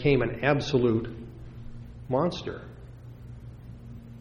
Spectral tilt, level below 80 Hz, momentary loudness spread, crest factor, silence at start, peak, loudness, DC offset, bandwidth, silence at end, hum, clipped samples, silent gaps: -7 dB/octave; -46 dBFS; 21 LU; 22 dB; 0 s; -8 dBFS; -27 LUFS; under 0.1%; 10 kHz; 0 s; none; under 0.1%; none